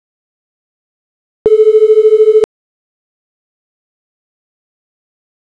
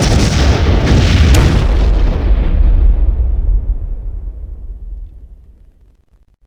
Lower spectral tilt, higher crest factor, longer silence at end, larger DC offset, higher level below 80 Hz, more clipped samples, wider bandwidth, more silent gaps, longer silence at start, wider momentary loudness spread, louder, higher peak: about the same, -5.5 dB/octave vs -6 dB/octave; about the same, 14 dB vs 12 dB; first, 3.1 s vs 1.1 s; neither; second, -56 dBFS vs -12 dBFS; neither; second, 4.4 kHz vs 12.5 kHz; neither; first, 1.45 s vs 0 s; second, 9 LU vs 21 LU; first, -9 LUFS vs -13 LUFS; about the same, -2 dBFS vs 0 dBFS